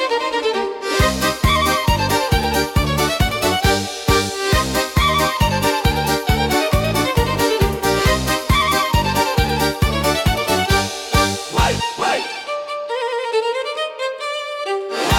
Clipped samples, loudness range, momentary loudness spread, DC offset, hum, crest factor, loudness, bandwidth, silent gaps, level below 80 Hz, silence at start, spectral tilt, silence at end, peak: under 0.1%; 3 LU; 7 LU; under 0.1%; none; 14 dB; -18 LUFS; 17.5 kHz; none; -28 dBFS; 0 s; -4 dB/octave; 0 s; -4 dBFS